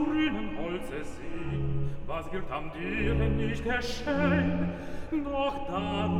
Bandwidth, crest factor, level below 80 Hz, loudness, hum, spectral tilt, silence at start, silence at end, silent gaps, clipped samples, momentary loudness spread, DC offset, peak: 12 kHz; 16 dB; -40 dBFS; -31 LUFS; none; -7 dB/octave; 0 s; 0 s; none; under 0.1%; 10 LU; under 0.1%; -14 dBFS